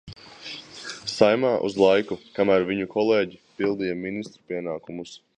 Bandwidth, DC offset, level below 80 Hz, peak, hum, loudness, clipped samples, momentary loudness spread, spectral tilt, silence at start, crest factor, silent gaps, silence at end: 10 kHz; under 0.1%; -60 dBFS; -2 dBFS; none; -24 LUFS; under 0.1%; 17 LU; -5.5 dB/octave; 0.05 s; 22 dB; none; 0.2 s